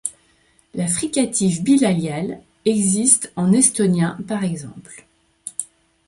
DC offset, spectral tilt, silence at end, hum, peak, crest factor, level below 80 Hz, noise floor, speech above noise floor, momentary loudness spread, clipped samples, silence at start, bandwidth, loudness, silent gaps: under 0.1%; -4.5 dB/octave; 0.45 s; none; 0 dBFS; 20 dB; -58 dBFS; -58 dBFS; 40 dB; 17 LU; under 0.1%; 0.05 s; 11.5 kHz; -18 LUFS; none